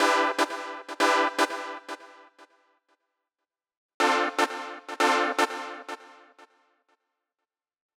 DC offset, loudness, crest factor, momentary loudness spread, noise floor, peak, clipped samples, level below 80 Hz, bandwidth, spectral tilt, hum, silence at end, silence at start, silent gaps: under 0.1%; -26 LUFS; 20 dB; 17 LU; -88 dBFS; -8 dBFS; under 0.1%; under -90 dBFS; 18.5 kHz; 0 dB/octave; none; 1.9 s; 0 s; 3.77-4.00 s